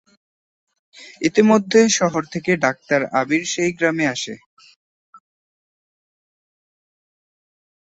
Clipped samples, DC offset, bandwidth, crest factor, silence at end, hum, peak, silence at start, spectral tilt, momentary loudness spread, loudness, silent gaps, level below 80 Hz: under 0.1%; under 0.1%; 8.2 kHz; 20 dB; 2.75 s; none; -2 dBFS; 1 s; -4 dB/octave; 10 LU; -18 LUFS; 4.46-4.57 s, 4.76-5.13 s; -64 dBFS